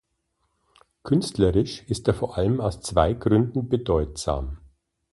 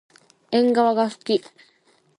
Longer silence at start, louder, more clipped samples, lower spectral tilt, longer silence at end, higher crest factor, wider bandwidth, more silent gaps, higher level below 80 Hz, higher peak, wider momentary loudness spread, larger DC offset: first, 1.05 s vs 0.5 s; second, -24 LUFS vs -21 LUFS; neither; about the same, -6.5 dB/octave vs -5.5 dB/octave; second, 0.55 s vs 0.8 s; about the same, 20 dB vs 16 dB; about the same, 11.5 kHz vs 11 kHz; neither; first, -38 dBFS vs -74 dBFS; about the same, -4 dBFS vs -6 dBFS; about the same, 7 LU vs 7 LU; neither